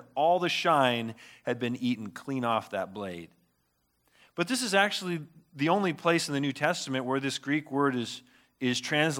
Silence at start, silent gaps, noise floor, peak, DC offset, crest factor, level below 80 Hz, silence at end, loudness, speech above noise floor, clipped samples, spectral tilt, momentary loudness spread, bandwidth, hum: 0 s; none; -74 dBFS; -8 dBFS; under 0.1%; 20 dB; -78 dBFS; 0 s; -29 LUFS; 45 dB; under 0.1%; -4 dB/octave; 13 LU; 17 kHz; none